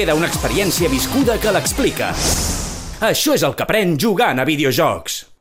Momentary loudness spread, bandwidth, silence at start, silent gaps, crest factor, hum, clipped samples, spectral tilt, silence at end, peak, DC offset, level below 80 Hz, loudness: 5 LU; 16.5 kHz; 0 s; none; 12 dB; none; under 0.1%; -3.5 dB/octave; 0.2 s; -4 dBFS; under 0.1%; -32 dBFS; -17 LUFS